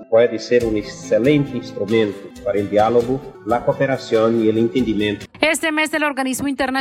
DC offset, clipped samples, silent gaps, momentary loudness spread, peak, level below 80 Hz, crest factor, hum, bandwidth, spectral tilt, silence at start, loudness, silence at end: under 0.1%; under 0.1%; none; 8 LU; -2 dBFS; -46 dBFS; 16 dB; none; 16 kHz; -5 dB/octave; 0 s; -18 LUFS; 0 s